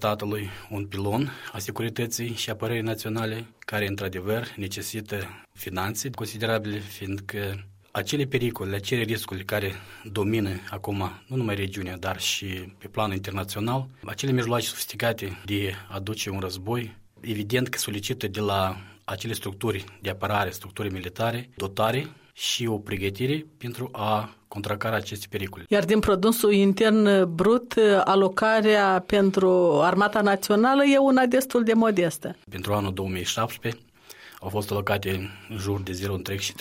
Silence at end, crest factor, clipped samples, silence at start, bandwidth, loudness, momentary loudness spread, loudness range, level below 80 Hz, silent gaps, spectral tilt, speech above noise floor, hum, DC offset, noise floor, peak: 0 s; 18 dB; under 0.1%; 0 s; 16.5 kHz; -26 LUFS; 14 LU; 10 LU; -56 dBFS; none; -5 dB/octave; 23 dB; none; under 0.1%; -48 dBFS; -8 dBFS